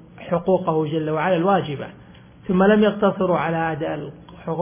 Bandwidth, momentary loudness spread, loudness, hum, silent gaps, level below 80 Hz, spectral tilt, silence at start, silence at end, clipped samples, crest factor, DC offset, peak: 3.6 kHz; 16 LU; -20 LUFS; none; none; -52 dBFS; -11 dB/octave; 0.15 s; 0 s; under 0.1%; 16 dB; under 0.1%; -4 dBFS